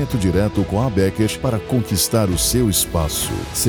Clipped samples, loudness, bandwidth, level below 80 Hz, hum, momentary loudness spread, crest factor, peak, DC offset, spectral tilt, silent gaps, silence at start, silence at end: under 0.1%; -18 LUFS; over 20 kHz; -32 dBFS; none; 4 LU; 14 dB; -4 dBFS; 0.2%; -4.5 dB/octave; none; 0 s; 0 s